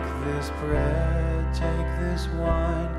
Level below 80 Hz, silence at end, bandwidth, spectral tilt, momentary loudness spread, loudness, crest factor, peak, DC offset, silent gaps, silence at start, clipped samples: -28 dBFS; 0 s; 11.5 kHz; -7.5 dB/octave; 4 LU; -26 LUFS; 16 dB; -10 dBFS; under 0.1%; none; 0 s; under 0.1%